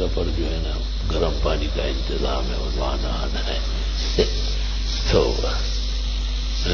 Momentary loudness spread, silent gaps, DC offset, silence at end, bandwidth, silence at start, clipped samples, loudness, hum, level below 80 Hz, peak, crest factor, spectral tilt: 5 LU; none; under 0.1%; 0 s; 6.8 kHz; 0 s; under 0.1%; -24 LUFS; none; -24 dBFS; -4 dBFS; 18 dB; -5 dB/octave